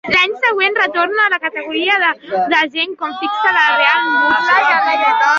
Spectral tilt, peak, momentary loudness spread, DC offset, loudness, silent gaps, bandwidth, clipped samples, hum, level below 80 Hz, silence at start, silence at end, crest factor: -2.5 dB/octave; 0 dBFS; 7 LU; under 0.1%; -13 LUFS; none; 7.6 kHz; under 0.1%; none; -60 dBFS; 0.05 s; 0 s; 14 dB